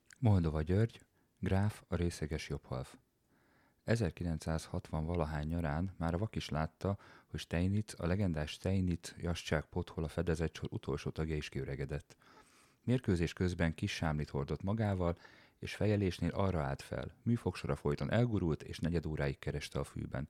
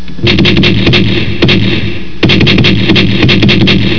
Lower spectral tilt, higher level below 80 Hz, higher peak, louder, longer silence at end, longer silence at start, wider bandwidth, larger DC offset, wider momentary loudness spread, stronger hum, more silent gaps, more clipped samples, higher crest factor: about the same, -7 dB/octave vs -6.5 dB/octave; second, -50 dBFS vs -24 dBFS; second, -18 dBFS vs 0 dBFS; second, -37 LUFS vs -7 LUFS; about the same, 0.05 s vs 0 s; first, 0.2 s vs 0 s; first, 13.5 kHz vs 5.4 kHz; second, under 0.1% vs 20%; about the same, 8 LU vs 6 LU; neither; neither; second, under 0.1% vs 2%; first, 20 dB vs 10 dB